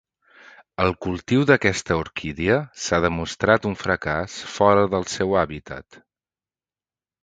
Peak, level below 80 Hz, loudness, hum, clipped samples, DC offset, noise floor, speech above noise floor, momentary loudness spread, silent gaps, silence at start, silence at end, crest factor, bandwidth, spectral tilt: 0 dBFS; -44 dBFS; -21 LUFS; none; under 0.1%; under 0.1%; under -90 dBFS; over 69 dB; 12 LU; none; 0.8 s; 1.4 s; 22 dB; 9.4 kHz; -5 dB/octave